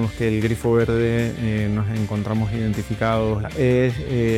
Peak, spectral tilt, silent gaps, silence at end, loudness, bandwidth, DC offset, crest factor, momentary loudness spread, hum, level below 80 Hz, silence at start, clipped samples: -6 dBFS; -7.5 dB/octave; none; 0 s; -21 LUFS; 14.5 kHz; under 0.1%; 14 dB; 5 LU; none; -38 dBFS; 0 s; under 0.1%